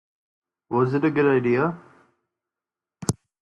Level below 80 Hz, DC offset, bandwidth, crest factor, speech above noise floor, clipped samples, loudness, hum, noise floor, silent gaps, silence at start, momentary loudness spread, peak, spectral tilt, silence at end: -60 dBFS; under 0.1%; 11.5 kHz; 22 dB; 69 dB; under 0.1%; -23 LUFS; none; -90 dBFS; none; 0.7 s; 10 LU; -4 dBFS; -6.5 dB/octave; 0.3 s